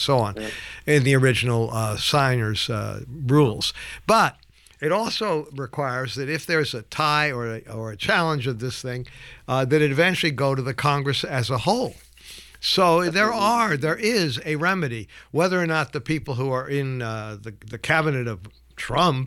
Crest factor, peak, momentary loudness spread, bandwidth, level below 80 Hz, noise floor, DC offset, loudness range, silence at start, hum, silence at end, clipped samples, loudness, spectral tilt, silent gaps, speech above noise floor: 18 dB; -6 dBFS; 13 LU; 16.5 kHz; -50 dBFS; -45 dBFS; under 0.1%; 3 LU; 0 s; none; 0 s; under 0.1%; -22 LUFS; -5 dB/octave; none; 22 dB